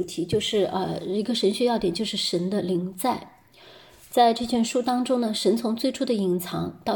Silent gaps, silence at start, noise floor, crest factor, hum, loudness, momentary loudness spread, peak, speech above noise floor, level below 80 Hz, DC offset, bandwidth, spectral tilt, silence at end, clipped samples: none; 0 s; -51 dBFS; 18 dB; none; -25 LUFS; 7 LU; -6 dBFS; 26 dB; -58 dBFS; under 0.1%; 17.5 kHz; -5 dB/octave; 0 s; under 0.1%